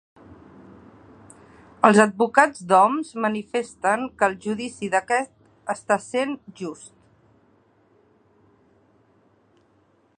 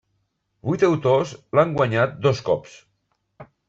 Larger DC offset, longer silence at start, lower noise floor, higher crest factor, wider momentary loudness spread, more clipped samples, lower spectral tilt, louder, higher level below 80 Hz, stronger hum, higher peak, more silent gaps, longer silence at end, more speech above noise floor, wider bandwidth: neither; first, 1.85 s vs 0.65 s; second, -62 dBFS vs -72 dBFS; first, 24 dB vs 18 dB; first, 17 LU vs 7 LU; neither; second, -4.5 dB/octave vs -7 dB/octave; about the same, -21 LUFS vs -21 LUFS; second, -66 dBFS vs -58 dBFS; neither; first, 0 dBFS vs -4 dBFS; neither; first, 3.3 s vs 0.25 s; second, 40 dB vs 51 dB; first, 11 kHz vs 7.8 kHz